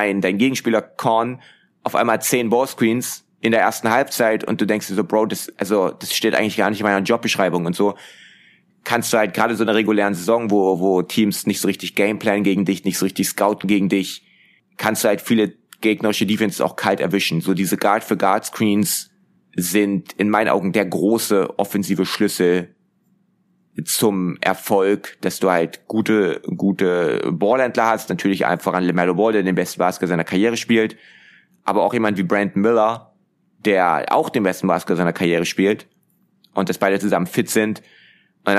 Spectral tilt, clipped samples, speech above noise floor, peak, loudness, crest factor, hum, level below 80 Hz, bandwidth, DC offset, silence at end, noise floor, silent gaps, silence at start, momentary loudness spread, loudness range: -4.5 dB/octave; under 0.1%; 44 dB; 0 dBFS; -19 LUFS; 18 dB; none; -66 dBFS; 15.5 kHz; under 0.1%; 0 s; -63 dBFS; none; 0 s; 6 LU; 2 LU